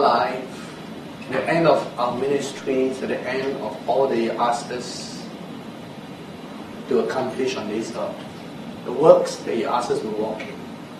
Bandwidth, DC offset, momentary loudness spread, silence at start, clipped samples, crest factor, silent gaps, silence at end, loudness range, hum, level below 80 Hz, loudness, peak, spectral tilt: 13 kHz; under 0.1%; 18 LU; 0 s; under 0.1%; 22 dB; none; 0 s; 6 LU; none; -62 dBFS; -23 LUFS; 0 dBFS; -5 dB/octave